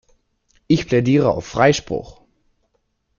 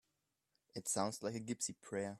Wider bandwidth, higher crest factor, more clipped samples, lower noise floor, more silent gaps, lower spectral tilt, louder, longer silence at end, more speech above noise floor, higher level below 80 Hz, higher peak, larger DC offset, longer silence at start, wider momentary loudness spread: second, 7.2 kHz vs 14.5 kHz; about the same, 18 dB vs 22 dB; neither; second, -68 dBFS vs -86 dBFS; neither; first, -6 dB/octave vs -3.5 dB/octave; first, -18 LUFS vs -41 LUFS; first, 1.05 s vs 0 s; first, 52 dB vs 44 dB; first, -46 dBFS vs -80 dBFS; first, -2 dBFS vs -20 dBFS; neither; about the same, 0.7 s vs 0.75 s; about the same, 9 LU vs 7 LU